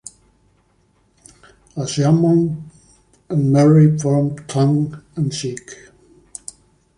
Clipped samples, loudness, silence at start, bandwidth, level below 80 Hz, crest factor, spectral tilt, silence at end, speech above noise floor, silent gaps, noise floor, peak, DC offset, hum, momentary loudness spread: under 0.1%; -17 LUFS; 1.75 s; 11 kHz; -54 dBFS; 16 dB; -7 dB/octave; 1.25 s; 44 dB; none; -59 dBFS; -2 dBFS; under 0.1%; none; 22 LU